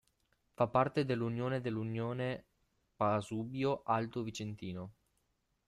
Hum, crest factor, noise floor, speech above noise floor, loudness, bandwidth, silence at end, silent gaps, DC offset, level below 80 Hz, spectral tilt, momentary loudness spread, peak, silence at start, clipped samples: none; 20 dB; -80 dBFS; 44 dB; -36 LUFS; 12.5 kHz; 0.75 s; none; under 0.1%; -70 dBFS; -7 dB/octave; 12 LU; -16 dBFS; 0.6 s; under 0.1%